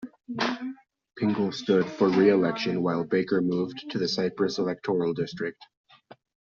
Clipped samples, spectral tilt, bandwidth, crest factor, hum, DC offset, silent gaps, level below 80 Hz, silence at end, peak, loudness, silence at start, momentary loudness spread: under 0.1%; -5 dB/octave; 7.4 kHz; 18 dB; none; under 0.1%; none; -68 dBFS; 0.9 s; -8 dBFS; -26 LUFS; 0 s; 10 LU